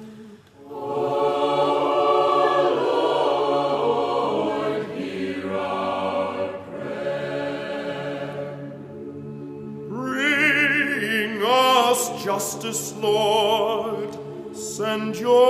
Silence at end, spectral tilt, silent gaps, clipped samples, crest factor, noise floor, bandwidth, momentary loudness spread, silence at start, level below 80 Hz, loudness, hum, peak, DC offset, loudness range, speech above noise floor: 0 s; -3.5 dB/octave; none; under 0.1%; 18 dB; -44 dBFS; 15.5 kHz; 16 LU; 0 s; -66 dBFS; -22 LUFS; none; -4 dBFS; under 0.1%; 9 LU; 24 dB